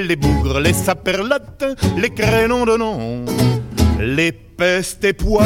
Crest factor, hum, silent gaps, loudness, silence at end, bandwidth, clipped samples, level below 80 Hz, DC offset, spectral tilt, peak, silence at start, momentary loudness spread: 16 dB; none; none; -17 LUFS; 0 s; 17 kHz; under 0.1%; -28 dBFS; under 0.1%; -5.5 dB/octave; 0 dBFS; 0 s; 5 LU